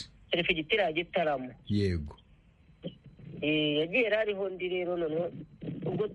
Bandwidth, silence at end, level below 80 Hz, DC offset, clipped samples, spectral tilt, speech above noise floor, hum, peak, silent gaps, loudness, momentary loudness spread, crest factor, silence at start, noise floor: 11 kHz; 0 s; -54 dBFS; under 0.1%; under 0.1%; -7 dB/octave; 29 dB; none; -12 dBFS; none; -30 LUFS; 18 LU; 20 dB; 0 s; -60 dBFS